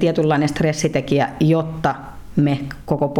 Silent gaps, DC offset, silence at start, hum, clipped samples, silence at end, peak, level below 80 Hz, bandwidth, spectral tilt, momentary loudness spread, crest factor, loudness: none; under 0.1%; 0 s; none; under 0.1%; 0 s; -6 dBFS; -42 dBFS; 13 kHz; -6.5 dB/octave; 7 LU; 14 dB; -19 LUFS